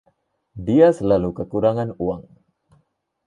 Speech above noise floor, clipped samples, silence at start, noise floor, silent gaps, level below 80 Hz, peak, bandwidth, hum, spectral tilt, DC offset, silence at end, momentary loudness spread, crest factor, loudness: 47 dB; under 0.1%; 0.55 s; -65 dBFS; none; -48 dBFS; -2 dBFS; 9.2 kHz; none; -8.5 dB/octave; under 0.1%; 1.05 s; 13 LU; 18 dB; -19 LUFS